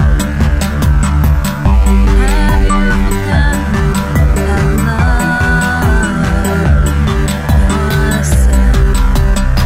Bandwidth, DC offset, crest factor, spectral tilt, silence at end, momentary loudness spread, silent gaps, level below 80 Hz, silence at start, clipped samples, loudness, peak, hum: 16 kHz; 2%; 10 dB; -6 dB/octave; 0 s; 3 LU; none; -12 dBFS; 0 s; under 0.1%; -12 LUFS; 0 dBFS; none